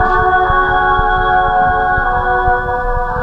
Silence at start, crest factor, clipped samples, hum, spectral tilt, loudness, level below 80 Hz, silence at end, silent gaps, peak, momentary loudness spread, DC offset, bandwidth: 0 s; 12 dB; under 0.1%; none; -7 dB/octave; -13 LUFS; -22 dBFS; 0 s; none; 0 dBFS; 4 LU; under 0.1%; 5.8 kHz